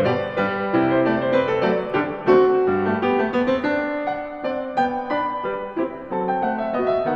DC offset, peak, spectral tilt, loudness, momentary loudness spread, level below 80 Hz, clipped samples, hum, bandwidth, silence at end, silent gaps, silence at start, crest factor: under 0.1%; -4 dBFS; -8 dB/octave; -21 LUFS; 9 LU; -54 dBFS; under 0.1%; none; 6.6 kHz; 0 s; none; 0 s; 16 dB